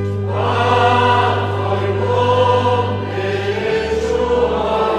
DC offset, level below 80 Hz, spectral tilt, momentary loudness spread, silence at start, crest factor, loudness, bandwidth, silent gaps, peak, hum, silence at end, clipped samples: under 0.1%; -38 dBFS; -6.5 dB/octave; 6 LU; 0 s; 14 dB; -16 LUFS; 9.4 kHz; none; -2 dBFS; 50 Hz at -25 dBFS; 0 s; under 0.1%